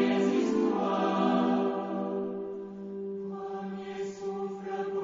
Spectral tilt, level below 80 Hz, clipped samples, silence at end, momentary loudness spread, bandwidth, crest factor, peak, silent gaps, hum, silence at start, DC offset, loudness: -6.5 dB/octave; -72 dBFS; under 0.1%; 0 s; 11 LU; 7.6 kHz; 16 dB; -14 dBFS; none; none; 0 s; under 0.1%; -31 LUFS